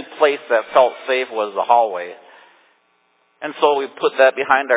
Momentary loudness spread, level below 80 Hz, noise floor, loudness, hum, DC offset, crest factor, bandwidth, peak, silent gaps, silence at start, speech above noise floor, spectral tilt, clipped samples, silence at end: 12 LU; -72 dBFS; -62 dBFS; -17 LUFS; none; under 0.1%; 18 dB; 4 kHz; 0 dBFS; none; 0 s; 45 dB; -6.5 dB/octave; under 0.1%; 0 s